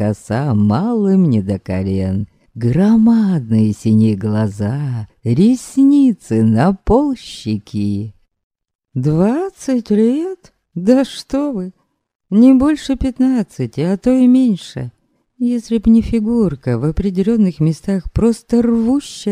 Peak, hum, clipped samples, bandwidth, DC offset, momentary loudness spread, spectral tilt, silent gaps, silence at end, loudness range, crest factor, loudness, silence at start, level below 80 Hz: 0 dBFS; none; under 0.1%; 11 kHz; under 0.1%; 11 LU; -8 dB/octave; 8.43-8.50 s, 8.75-8.79 s, 12.15-12.20 s; 0 s; 3 LU; 14 dB; -15 LUFS; 0 s; -36 dBFS